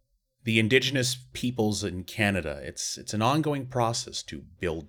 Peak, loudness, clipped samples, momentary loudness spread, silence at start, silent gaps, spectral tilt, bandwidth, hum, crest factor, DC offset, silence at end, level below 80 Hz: -6 dBFS; -27 LUFS; under 0.1%; 12 LU; 0.45 s; none; -4 dB/octave; 19 kHz; none; 22 dB; under 0.1%; 0 s; -54 dBFS